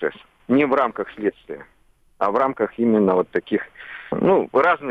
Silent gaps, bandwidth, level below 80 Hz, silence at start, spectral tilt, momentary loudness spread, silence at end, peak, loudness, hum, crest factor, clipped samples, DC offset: none; 6 kHz; -58 dBFS; 0 s; -8.5 dB/octave; 17 LU; 0 s; -6 dBFS; -20 LUFS; none; 16 dB; under 0.1%; under 0.1%